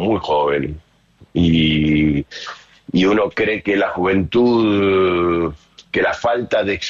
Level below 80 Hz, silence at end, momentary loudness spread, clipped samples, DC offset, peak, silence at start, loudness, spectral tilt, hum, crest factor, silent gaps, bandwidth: -38 dBFS; 0 s; 11 LU; under 0.1%; under 0.1%; -6 dBFS; 0 s; -17 LUFS; -6.5 dB/octave; none; 12 dB; none; 7.4 kHz